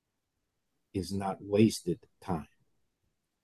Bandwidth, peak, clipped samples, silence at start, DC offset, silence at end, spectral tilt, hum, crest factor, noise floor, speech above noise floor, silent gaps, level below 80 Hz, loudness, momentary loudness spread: 12.5 kHz; -12 dBFS; under 0.1%; 0.95 s; under 0.1%; 1 s; -6 dB/octave; none; 22 dB; -83 dBFS; 52 dB; none; -58 dBFS; -32 LUFS; 12 LU